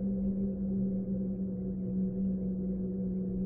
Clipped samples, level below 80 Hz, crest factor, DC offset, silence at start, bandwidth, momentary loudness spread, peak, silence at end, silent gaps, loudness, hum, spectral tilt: under 0.1%; -48 dBFS; 10 dB; under 0.1%; 0 s; 1.2 kHz; 3 LU; -24 dBFS; 0 s; none; -34 LUFS; none; -15.5 dB/octave